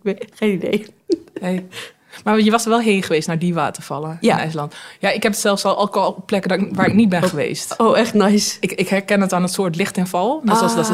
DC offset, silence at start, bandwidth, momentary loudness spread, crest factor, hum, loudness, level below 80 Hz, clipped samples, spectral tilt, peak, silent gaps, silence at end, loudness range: under 0.1%; 0.05 s; 16 kHz; 10 LU; 16 dB; none; -18 LUFS; -58 dBFS; under 0.1%; -5 dB/octave; -2 dBFS; none; 0 s; 3 LU